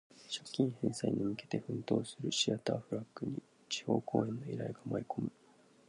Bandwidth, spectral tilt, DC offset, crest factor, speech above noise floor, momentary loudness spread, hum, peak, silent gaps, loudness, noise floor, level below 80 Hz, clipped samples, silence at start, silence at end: 11 kHz; -5 dB/octave; under 0.1%; 20 dB; 28 dB; 9 LU; none; -16 dBFS; none; -37 LUFS; -65 dBFS; -72 dBFS; under 0.1%; 0.15 s; 0.6 s